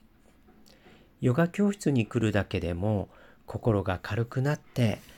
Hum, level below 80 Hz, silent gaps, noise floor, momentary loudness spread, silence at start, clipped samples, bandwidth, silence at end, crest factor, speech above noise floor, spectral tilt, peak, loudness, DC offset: none; -52 dBFS; none; -58 dBFS; 6 LU; 1.2 s; under 0.1%; 16.5 kHz; 0.05 s; 16 dB; 31 dB; -7 dB/octave; -12 dBFS; -28 LUFS; under 0.1%